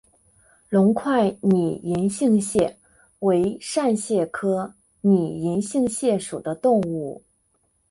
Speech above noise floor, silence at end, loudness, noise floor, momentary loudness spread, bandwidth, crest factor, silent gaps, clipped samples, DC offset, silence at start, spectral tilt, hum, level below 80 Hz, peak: 46 dB; 0.7 s; -22 LUFS; -67 dBFS; 7 LU; 11.5 kHz; 14 dB; none; under 0.1%; under 0.1%; 0.7 s; -6.5 dB/octave; none; -58 dBFS; -8 dBFS